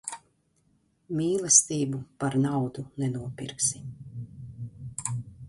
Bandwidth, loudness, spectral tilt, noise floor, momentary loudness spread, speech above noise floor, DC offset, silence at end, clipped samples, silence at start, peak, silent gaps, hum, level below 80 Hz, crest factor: 11.5 kHz; -26 LUFS; -4 dB/octave; -68 dBFS; 22 LU; 41 dB; under 0.1%; 0 s; under 0.1%; 0.05 s; -6 dBFS; none; none; -60 dBFS; 24 dB